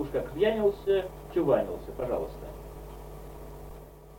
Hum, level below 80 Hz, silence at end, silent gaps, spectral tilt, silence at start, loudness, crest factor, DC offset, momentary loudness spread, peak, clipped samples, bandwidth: none; -46 dBFS; 0 s; none; -7 dB/octave; 0 s; -29 LUFS; 20 dB; under 0.1%; 19 LU; -12 dBFS; under 0.1%; 17 kHz